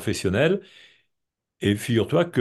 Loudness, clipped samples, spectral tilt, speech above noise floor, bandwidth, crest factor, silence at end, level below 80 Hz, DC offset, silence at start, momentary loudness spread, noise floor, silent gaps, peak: -23 LUFS; under 0.1%; -6 dB/octave; 59 dB; 12.5 kHz; 16 dB; 0 s; -56 dBFS; under 0.1%; 0 s; 5 LU; -82 dBFS; none; -8 dBFS